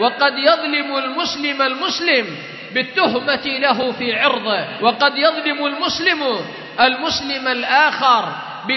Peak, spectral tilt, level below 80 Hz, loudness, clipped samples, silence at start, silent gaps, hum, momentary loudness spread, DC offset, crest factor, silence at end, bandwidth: 0 dBFS; -3 dB/octave; -60 dBFS; -17 LUFS; under 0.1%; 0 s; none; none; 7 LU; under 0.1%; 18 dB; 0 s; 6.2 kHz